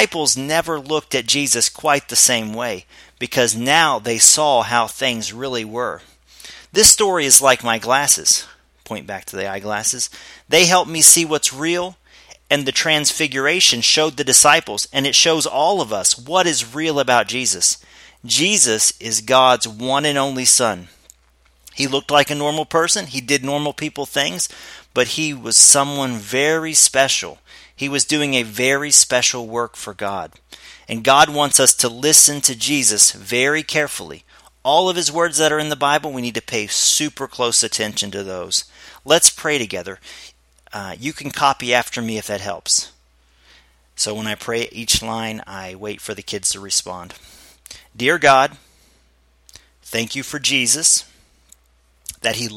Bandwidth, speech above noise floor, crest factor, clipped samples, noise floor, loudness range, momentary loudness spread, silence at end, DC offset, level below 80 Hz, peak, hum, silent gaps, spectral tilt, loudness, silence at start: 16.5 kHz; 40 dB; 18 dB; under 0.1%; -57 dBFS; 8 LU; 16 LU; 0 s; under 0.1%; -52 dBFS; 0 dBFS; none; none; -1 dB/octave; -15 LUFS; 0 s